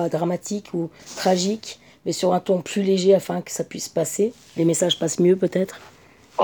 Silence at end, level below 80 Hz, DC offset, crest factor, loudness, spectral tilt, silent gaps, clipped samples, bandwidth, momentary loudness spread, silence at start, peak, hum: 0 s; -66 dBFS; under 0.1%; 18 dB; -22 LUFS; -5 dB/octave; none; under 0.1%; over 20 kHz; 11 LU; 0 s; -6 dBFS; none